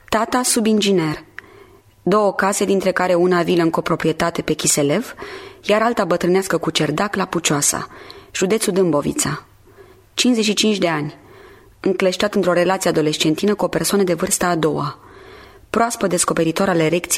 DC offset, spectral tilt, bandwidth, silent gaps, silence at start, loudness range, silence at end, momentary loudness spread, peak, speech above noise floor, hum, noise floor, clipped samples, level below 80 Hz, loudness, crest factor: under 0.1%; -4 dB/octave; 16 kHz; none; 0.1 s; 2 LU; 0 s; 9 LU; -2 dBFS; 29 dB; none; -47 dBFS; under 0.1%; -50 dBFS; -18 LUFS; 16 dB